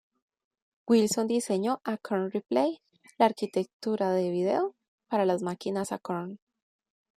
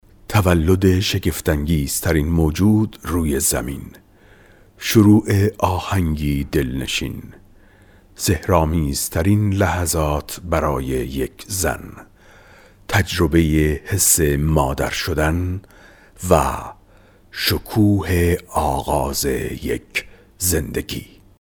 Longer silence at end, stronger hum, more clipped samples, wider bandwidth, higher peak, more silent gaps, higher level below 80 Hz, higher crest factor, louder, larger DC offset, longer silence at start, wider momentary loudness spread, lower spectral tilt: first, 0.85 s vs 0.35 s; neither; neither; second, 14.5 kHz vs over 20 kHz; second, -10 dBFS vs 0 dBFS; first, 3.73-3.80 s, 4.88-4.98 s vs none; second, -76 dBFS vs -32 dBFS; about the same, 20 dB vs 20 dB; second, -29 LUFS vs -19 LUFS; neither; first, 0.85 s vs 0.3 s; about the same, 9 LU vs 11 LU; about the same, -5.5 dB/octave vs -5 dB/octave